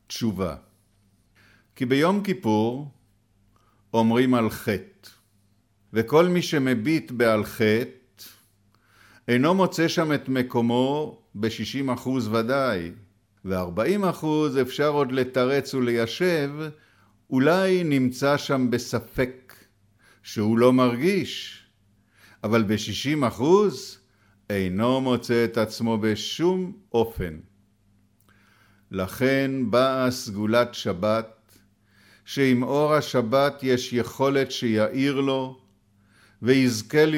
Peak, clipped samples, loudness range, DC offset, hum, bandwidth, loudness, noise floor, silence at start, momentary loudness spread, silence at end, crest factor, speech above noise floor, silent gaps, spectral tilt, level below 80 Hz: -6 dBFS; under 0.1%; 3 LU; under 0.1%; none; 17.5 kHz; -24 LUFS; -64 dBFS; 0.1 s; 11 LU; 0 s; 18 dB; 42 dB; none; -6 dB/octave; -56 dBFS